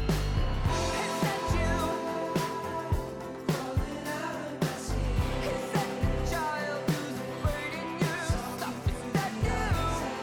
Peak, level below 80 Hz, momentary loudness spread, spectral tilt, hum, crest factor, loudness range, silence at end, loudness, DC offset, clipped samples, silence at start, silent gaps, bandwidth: -18 dBFS; -36 dBFS; 5 LU; -5.5 dB/octave; none; 12 dB; 2 LU; 0 s; -31 LUFS; under 0.1%; under 0.1%; 0 s; none; 19.5 kHz